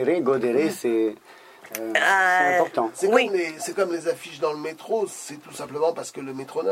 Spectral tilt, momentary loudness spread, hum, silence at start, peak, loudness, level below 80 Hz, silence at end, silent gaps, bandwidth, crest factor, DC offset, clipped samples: -3.5 dB/octave; 16 LU; none; 0 s; -4 dBFS; -23 LUFS; -76 dBFS; 0 s; none; 16 kHz; 20 dB; under 0.1%; under 0.1%